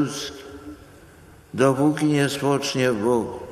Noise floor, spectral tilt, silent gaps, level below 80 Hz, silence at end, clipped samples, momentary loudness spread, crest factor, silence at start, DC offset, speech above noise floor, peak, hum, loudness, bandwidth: -48 dBFS; -5.5 dB/octave; none; -56 dBFS; 0 s; under 0.1%; 20 LU; 20 dB; 0 s; under 0.1%; 27 dB; -4 dBFS; none; -22 LUFS; 14 kHz